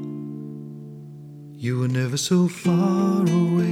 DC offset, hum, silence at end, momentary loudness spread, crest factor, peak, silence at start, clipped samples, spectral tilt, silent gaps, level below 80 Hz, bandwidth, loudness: under 0.1%; none; 0 s; 20 LU; 14 dB; -8 dBFS; 0 s; under 0.1%; -6.5 dB/octave; none; -68 dBFS; 14.5 kHz; -22 LUFS